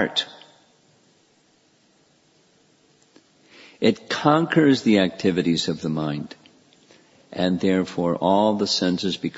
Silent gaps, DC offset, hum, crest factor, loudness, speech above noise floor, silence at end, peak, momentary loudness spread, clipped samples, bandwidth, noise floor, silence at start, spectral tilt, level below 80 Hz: none; under 0.1%; none; 22 dB; -21 LUFS; 40 dB; 0.1 s; -2 dBFS; 9 LU; under 0.1%; 8 kHz; -61 dBFS; 0 s; -5.5 dB/octave; -62 dBFS